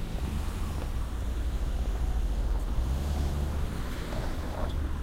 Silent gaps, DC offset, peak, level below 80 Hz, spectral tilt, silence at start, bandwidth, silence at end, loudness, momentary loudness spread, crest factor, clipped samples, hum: none; under 0.1%; -18 dBFS; -30 dBFS; -6.5 dB/octave; 0 s; 16 kHz; 0 s; -34 LUFS; 4 LU; 12 dB; under 0.1%; none